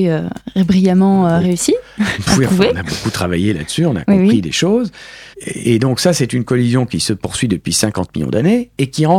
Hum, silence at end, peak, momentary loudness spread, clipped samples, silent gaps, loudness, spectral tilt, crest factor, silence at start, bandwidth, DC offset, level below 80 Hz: none; 0 s; 0 dBFS; 8 LU; under 0.1%; none; -15 LUFS; -5.5 dB/octave; 14 dB; 0 s; 15.5 kHz; under 0.1%; -40 dBFS